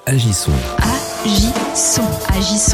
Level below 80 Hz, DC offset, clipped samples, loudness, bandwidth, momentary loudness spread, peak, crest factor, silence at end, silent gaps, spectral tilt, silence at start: -24 dBFS; under 0.1%; under 0.1%; -16 LUFS; 18 kHz; 4 LU; -2 dBFS; 14 dB; 0 s; none; -4 dB/octave; 0.05 s